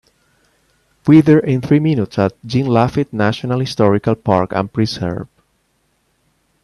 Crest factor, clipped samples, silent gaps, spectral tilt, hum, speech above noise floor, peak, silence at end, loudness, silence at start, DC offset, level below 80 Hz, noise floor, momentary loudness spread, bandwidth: 16 dB; under 0.1%; none; -8 dB/octave; none; 49 dB; 0 dBFS; 1.4 s; -15 LUFS; 1.05 s; under 0.1%; -50 dBFS; -63 dBFS; 10 LU; 11.5 kHz